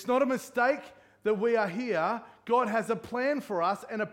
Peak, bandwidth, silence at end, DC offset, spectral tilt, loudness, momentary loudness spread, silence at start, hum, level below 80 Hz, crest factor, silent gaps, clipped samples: -14 dBFS; 16.5 kHz; 0 s; under 0.1%; -5.5 dB/octave; -29 LUFS; 6 LU; 0 s; none; -72 dBFS; 16 dB; none; under 0.1%